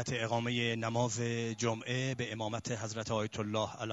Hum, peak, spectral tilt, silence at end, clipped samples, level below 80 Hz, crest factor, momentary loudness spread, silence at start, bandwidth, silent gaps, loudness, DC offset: none; -18 dBFS; -4.5 dB/octave; 0 s; under 0.1%; -68 dBFS; 18 dB; 5 LU; 0 s; 8 kHz; none; -35 LUFS; under 0.1%